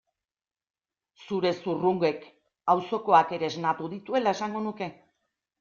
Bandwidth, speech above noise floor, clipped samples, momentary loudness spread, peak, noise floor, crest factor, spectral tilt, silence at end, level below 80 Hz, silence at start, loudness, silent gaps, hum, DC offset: 7.2 kHz; over 64 dB; under 0.1%; 12 LU; -6 dBFS; under -90 dBFS; 22 dB; -6 dB/octave; 0.7 s; -72 dBFS; 1.2 s; -27 LUFS; none; none; under 0.1%